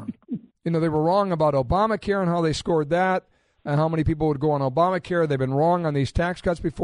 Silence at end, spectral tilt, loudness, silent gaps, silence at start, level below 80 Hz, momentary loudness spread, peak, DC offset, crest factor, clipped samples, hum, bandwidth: 0 s; -7 dB/octave; -23 LUFS; none; 0 s; -40 dBFS; 6 LU; -8 dBFS; under 0.1%; 14 dB; under 0.1%; none; 10.5 kHz